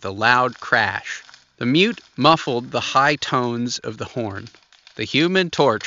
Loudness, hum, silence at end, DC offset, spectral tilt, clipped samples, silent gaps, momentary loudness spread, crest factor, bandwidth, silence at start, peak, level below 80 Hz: -19 LUFS; none; 0 s; under 0.1%; -2.5 dB/octave; under 0.1%; none; 12 LU; 20 dB; 7.8 kHz; 0 s; 0 dBFS; -60 dBFS